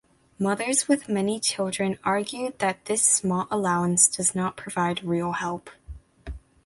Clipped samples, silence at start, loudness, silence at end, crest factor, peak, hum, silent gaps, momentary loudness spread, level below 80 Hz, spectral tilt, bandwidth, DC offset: under 0.1%; 0.4 s; -24 LUFS; 0.3 s; 22 dB; -4 dBFS; none; none; 12 LU; -50 dBFS; -3.5 dB/octave; 11.5 kHz; under 0.1%